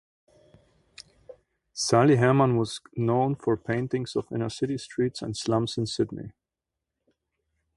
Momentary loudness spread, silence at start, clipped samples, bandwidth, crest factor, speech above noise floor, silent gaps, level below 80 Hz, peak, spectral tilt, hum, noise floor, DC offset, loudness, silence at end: 11 LU; 1.3 s; under 0.1%; 11.5 kHz; 22 dB; 62 dB; none; -60 dBFS; -6 dBFS; -6 dB/octave; none; -87 dBFS; under 0.1%; -26 LUFS; 1.45 s